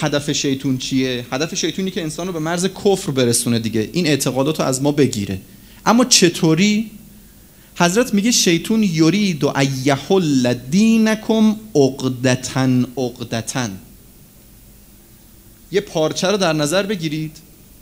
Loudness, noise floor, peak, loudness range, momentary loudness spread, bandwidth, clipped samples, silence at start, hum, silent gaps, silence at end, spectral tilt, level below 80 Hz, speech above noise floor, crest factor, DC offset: -17 LUFS; -45 dBFS; 0 dBFS; 7 LU; 9 LU; 16 kHz; under 0.1%; 0 s; none; none; 0.4 s; -4.5 dB/octave; -50 dBFS; 28 dB; 18 dB; under 0.1%